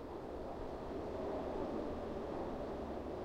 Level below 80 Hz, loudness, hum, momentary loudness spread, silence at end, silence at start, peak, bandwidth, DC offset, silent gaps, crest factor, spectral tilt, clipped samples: -54 dBFS; -44 LUFS; none; 4 LU; 0 s; 0 s; -30 dBFS; 16 kHz; under 0.1%; none; 14 dB; -7.5 dB/octave; under 0.1%